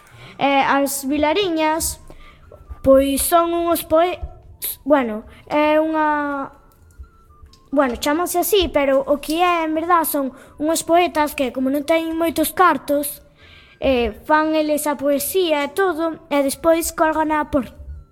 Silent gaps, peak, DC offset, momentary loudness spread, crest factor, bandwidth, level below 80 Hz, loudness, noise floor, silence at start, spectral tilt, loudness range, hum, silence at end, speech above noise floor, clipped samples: none; -2 dBFS; under 0.1%; 9 LU; 18 dB; 18 kHz; -42 dBFS; -19 LUFS; -47 dBFS; 0.2 s; -3.5 dB/octave; 3 LU; none; 0.1 s; 29 dB; under 0.1%